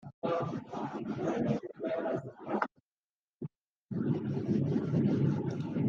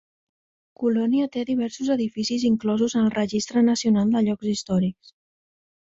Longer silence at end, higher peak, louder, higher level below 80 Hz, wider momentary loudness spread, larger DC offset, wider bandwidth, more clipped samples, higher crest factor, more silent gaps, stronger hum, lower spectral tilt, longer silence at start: second, 0 s vs 1 s; about the same, -12 dBFS vs -10 dBFS; second, -34 LUFS vs -23 LUFS; second, -70 dBFS vs -60 dBFS; first, 10 LU vs 5 LU; neither; second, 7.2 kHz vs 8 kHz; neither; first, 22 dB vs 14 dB; first, 0.14-0.22 s, 2.80-2.91 s, 2.99-3.40 s, 3.60-3.86 s vs none; neither; first, -9 dB/octave vs -5.5 dB/octave; second, 0.05 s vs 0.8 s